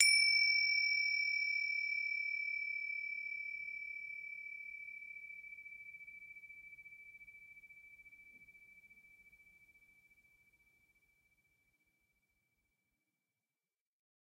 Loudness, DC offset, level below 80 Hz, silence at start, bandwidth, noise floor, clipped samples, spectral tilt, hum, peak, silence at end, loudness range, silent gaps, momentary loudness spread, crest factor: -35 LUFS; under 0.1%; -84 dBFS; 0 s; 16 kHz; under -90 dBFS; under 0.1%; 4.5 dB/octave; none; -12 dBFS; 5.35 s; 25 LU; none; 25 LU; 28 dB